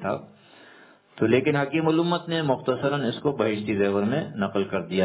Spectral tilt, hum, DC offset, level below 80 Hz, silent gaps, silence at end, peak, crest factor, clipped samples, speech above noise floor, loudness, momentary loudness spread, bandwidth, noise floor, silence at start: -10.5 dB/octave; none; under 0.1%; -60 dBFS; none; 0 s; -6 dBFS; 18 dB; under 0.1%; 28 dB; -25 LUFS; 6 LU; 4 kHz; -52 dBFS; 0 s